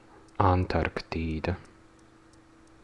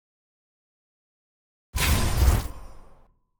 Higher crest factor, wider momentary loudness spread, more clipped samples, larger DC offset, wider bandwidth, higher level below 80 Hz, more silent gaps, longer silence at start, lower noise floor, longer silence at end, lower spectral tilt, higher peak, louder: about the same, 24 dB vs 22 dB; about the same, 12 LU vs 13 LU; neither; neither; second, 9.2 kHz vs over 20 kHz; second, -48 dBFS vs -30 dBFS; neither; second, 0.4 s vs 1.75 s; about the same, -56 dBFS vs -55 dBFS; first, 1.2 s vs 0.55 s; first, -8 dB/octave vs -4 dB/octave; about the same, -6 dBFS vs -6 dBFS; second, -29 LUFS vs -25 LUFS